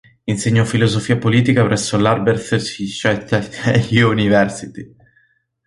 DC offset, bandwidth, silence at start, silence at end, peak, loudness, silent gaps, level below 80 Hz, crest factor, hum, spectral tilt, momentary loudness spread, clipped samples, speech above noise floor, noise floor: under 0.1%; 11.5 kHz; 0.25 s; 0.8 s; -2 dBFS; -16 LUFS; none; -46 dBFS; 16 dB; none; -5.5 dB/octave; 8 LU; under 0.1%; 43 dB; -59 dBFS